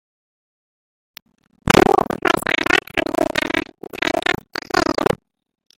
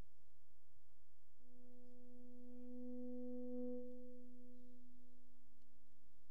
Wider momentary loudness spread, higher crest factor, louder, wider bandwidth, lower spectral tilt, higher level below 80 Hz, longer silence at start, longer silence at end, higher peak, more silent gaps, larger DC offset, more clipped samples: second, 11 LU vs 18 LU; about the same, 20 dB vs 16 dB; first, -18 LUFS vs -54 LUFS; first, 17 kHz vs 15 kHz; second, -4 dB/octave vs -9.5 dB/octave; first, -44 dBFS vs -80 dBFS; first, 1.65 s vs 0 s; first, 0.65 s vs 0 s; first, 0 dBFS vs -36 dBFS; neither; second, under 0.1% vs 0.7%; neither